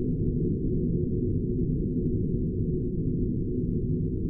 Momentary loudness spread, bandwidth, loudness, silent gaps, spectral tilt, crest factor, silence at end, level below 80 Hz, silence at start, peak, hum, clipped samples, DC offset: 1 LU; 0.8 kHz; -29 LUFS; none; -16 dB/octave; 12 dB; 0 s; -34 dBFS; 0 s; -14 dBFS; none; under 0.1%; under 0.1%